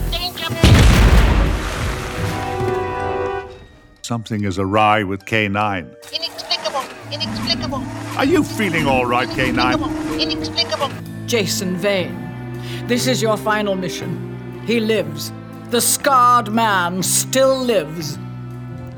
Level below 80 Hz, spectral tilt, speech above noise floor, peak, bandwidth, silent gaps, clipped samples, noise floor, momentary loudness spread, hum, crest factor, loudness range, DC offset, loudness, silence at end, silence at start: -26 dBFS; -4.5 dB/octave; 25 dB; 0 dBFS; over 20 kHz; none; under 0.1%; -43 dBFS; 15 LU; none; 18 dB; 5 LU; under 0.1%; -18 LUFS; 0 s; 0 s